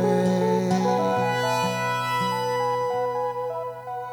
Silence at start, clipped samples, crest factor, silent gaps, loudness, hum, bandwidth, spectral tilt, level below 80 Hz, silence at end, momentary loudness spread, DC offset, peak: 0 s; under 0.1%; 14 dB; none; -24 LUFS; 50 Hz at -60 dBFS; 19.5 kHz; -5.5 dB/octave; -64 dBFS; 0 s; 8 LU; under 0.1%; -10 dBFS